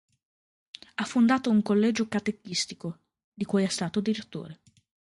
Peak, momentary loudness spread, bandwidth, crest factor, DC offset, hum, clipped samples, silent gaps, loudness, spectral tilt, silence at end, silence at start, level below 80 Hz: -10 dBFS; 18 LU; 11.5 kHz; 18 dB; under 0.1%; none; under 0.1%; 3.24-3.32 s; -27 LUFS; -5 dB/octave; 0.6 s; 1 s; -68 dBFS